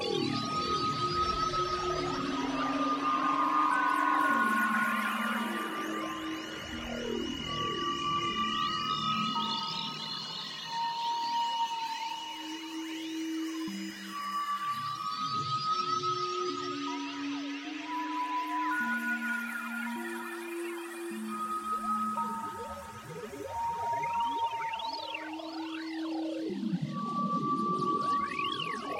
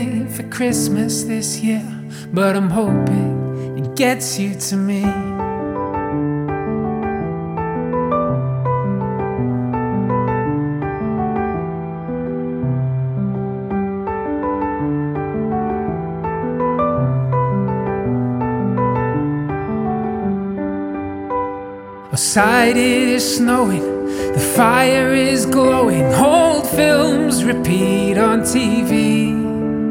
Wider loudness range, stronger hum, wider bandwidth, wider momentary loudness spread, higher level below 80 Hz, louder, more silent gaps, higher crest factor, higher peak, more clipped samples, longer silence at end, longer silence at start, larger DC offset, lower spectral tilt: about the same, 6 LU vs 7 LU; neither; about the same, 16.5 kHz vs 17.5 kHz; about the same, 10 LU vs 10 LU; second, -60 dBFS vs -42 dBFS; second, -32 LUFS vs -18 LUFS; neither; about the same, 18 dB vs 18 dB; second, -16 dBFS vs 0 dBFS; neither; about the same, 0 s vs 0 s; about the same, 0 s vs 0 s; neither; second, -4 dB/octave vs -5.5 dB/octave